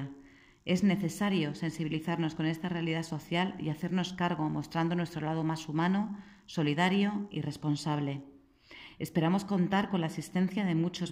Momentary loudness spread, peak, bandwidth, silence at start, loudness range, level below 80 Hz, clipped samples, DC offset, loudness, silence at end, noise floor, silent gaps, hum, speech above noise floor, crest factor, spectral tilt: 8 LU; -14 dBFS; 15.5 kHz; 0 s; 1 LU; -66 dBFS; under 0.1%; under 0.1%; -32 LUFS; 0 s; -57 dBFS; none; none; 26 dB; 18 dB; -6.5 dB/octave